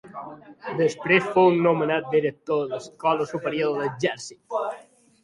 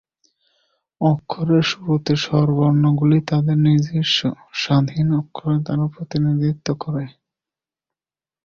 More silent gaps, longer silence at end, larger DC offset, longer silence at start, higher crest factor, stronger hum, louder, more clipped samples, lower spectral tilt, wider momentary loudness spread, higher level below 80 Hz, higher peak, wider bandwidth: neither; second, 0.45 s vs 1.35 s; neither; second, 0.05 s vs 1 s; about the same, 18 dB vs 16 dB; neither; second, -23 LUFS vs -19 LUFS; neither; second, -5.5 dB/octave vs -7 dB/octave; first, 18 LU vs 8 LU; second, -66 dBFS vs -52 dBFS; about the same, -6 dBFS vs -4 dBFS; first, 11.5 kHz vs 7.2 kHz